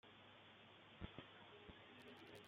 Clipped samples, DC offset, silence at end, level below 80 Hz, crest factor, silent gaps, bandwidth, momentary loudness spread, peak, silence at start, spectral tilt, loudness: under 0.1%; under 0.1%; 0 s; -74 dBFS; 24 dB; none; 15.5 kHz; 7 LU; -38 dBFS; 0.05 s; -5.5 dB/octave; -61 LUFS